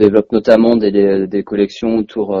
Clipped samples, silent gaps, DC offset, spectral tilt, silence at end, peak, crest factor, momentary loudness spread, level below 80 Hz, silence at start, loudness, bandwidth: 0.1%; none; under 0.1%; -7.5 dB/octave; 0 s; 0 dBFS; 12 dB; 7 LU; -46 dBFS; 0 s; -13 LUFS; 7.4 kHz